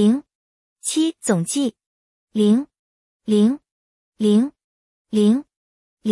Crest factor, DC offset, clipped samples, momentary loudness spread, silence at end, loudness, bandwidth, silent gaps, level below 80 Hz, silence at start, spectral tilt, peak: 16 dB; under 0.1%; under 0.1%; 11 LU; 0 s; -20 LUFS; 12 kHz; 0.35-0.76 s, 1.86-2.27 s, 2.79-3.20 s, 3.71-4.12 s, 4.64-5.05 s, 5.56-5.97 s; -68 dBFS; 0 s; -5.5 dB/octave; -4 dBFS